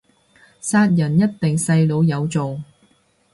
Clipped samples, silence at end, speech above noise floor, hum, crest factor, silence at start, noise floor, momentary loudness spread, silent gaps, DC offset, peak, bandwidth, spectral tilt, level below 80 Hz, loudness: under 0.1%; 0.7 s; 42 dB; none; 14 dB; 0.65 s; -59 dBFS; 11 LU; none; under 0.1%; -6 dBFS; 11.5 kHz; -6.5 dB/octave; -56 dBFS; -18 LUFS